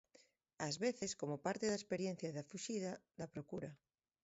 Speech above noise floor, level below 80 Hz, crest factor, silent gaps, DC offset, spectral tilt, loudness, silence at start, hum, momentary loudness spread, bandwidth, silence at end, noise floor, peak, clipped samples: 29 dB; -78 dBFS; 20 dB; none; under 0.1%; -4.5 dB/octave; -44 LUFS; 0.6 s; none; 10 LU; 8 kHz; 0.5 s; -72 dBFS; -26 dBFS; under 0.1%